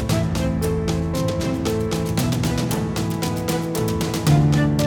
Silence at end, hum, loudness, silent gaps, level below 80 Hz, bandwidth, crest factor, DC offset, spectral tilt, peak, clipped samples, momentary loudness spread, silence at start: 0 s; none; -21 LUFS; none; -34 dBFS; 19.5 kHz; 16 dB; under 0.1%; -6 dB/octave; -6 dBFS; under 0.1%; 6 LU; 0 s